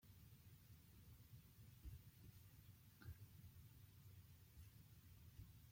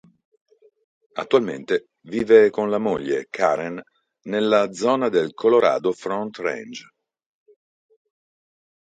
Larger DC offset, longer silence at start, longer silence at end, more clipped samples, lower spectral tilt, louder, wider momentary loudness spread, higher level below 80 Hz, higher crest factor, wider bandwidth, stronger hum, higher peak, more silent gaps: neither; second, 0 s vs 1.15 s; second, 0 s vs 2 s; neither; about the same, -5 dB/octave vs -5.5 dB/octave; second, -65 LUFS vs -21 LUFS; second, 5 LU vs 17 LU; about the same, -70 dBFS vs -66 dBFS; about the same, 18 dB vs 20 dB; first, 16.5 kHz vs 9 kHz; neither; second, -46 dBFS vs -2 dBFS; neither